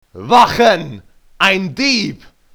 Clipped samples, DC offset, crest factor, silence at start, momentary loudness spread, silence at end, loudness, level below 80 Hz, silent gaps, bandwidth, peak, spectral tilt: 0.1%; under 0.1%; 14 dB; 0.15 s; 10 LU; 0.4 s; -13 LUFS; -46 dBFS; none; over 20 kHz; 0 dBFS; -4 dB/octave